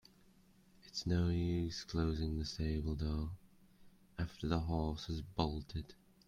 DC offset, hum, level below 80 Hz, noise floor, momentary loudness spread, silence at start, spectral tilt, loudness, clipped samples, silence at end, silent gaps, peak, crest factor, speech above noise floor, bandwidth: under 0.1%; none; -50 dBFS; -67 dBFS; 11 LU; 0.85 s; -6.5 dB/octave; -39 LUFS; under 0.1%; 0.35 s; none; -18 dBFS; 22 dB; 29 dB; 9.6 kHz